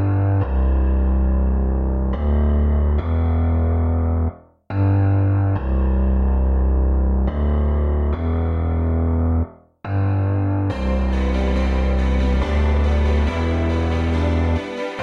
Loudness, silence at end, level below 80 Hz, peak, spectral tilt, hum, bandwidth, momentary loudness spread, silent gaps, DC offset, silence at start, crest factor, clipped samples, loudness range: -20 LUFS; 0 s; -20 dBFS; -10 dBFS; -9 dB/octave; none; 6.4 kHz; 3 LU; none; under 0.1%; 0 s; 8 dB; under 0.1%; 2 LU